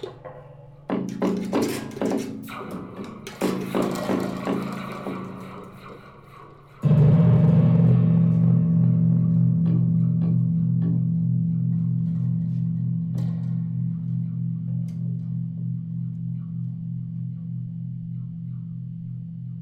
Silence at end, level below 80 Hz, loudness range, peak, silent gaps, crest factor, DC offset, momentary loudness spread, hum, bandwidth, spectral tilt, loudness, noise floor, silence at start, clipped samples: 0 s; -54 dBFS; 12 LU; -12 dBFS; none; 12 dB; under 0.1%; 17 LU; none; 13 kHz; -9 dB/octave; -23 LUFS; -46 dBFS; 0 s; under 0.1%